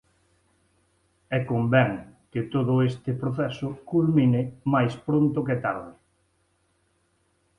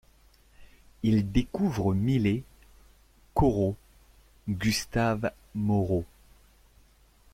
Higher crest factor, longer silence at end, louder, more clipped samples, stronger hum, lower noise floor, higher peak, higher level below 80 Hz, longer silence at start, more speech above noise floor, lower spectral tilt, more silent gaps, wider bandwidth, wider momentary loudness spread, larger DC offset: about the same, 20 dB vs 18 dB; first, 1.65 s vs 1.3 s; first, -25 LUFS vs -28 LUFS; neither; neither; first, -69 dBFS vs -60 dBFS; first, -6 dBFS vs -10 dBFS; second, -58 dBFS vs -44 dBFS; first, 1.3 s vs 0.6 s; first, 45 dB vs 33 dB; first, -9 dB/octave vs -6.5 dB/octave; neither; second, 9.8 kHz vs 16 kHz; first, 12 LU vs 8 LU; neither